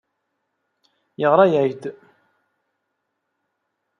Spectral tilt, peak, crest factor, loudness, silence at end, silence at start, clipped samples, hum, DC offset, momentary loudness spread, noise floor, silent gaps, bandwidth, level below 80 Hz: -8 dB/octave; -2 dBFS; 22 dB; -18 LUFS; 2.1 s; 1.2 s; under 0.1%; none; under 0.1%; 19 LU; -76 dBFS; none; 7 kHz; -74 dBFS